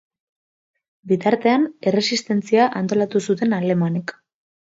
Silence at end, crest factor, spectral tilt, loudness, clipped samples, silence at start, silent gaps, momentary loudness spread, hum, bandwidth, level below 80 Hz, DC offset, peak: 0.65 s; 18 dB; -5.5 dB/octave; -20 LUFS; under 0.1%; 1.05 s; none; 6 LU; none; 8 kHz; -68 dBFS; under 0.1%; -4 dBFS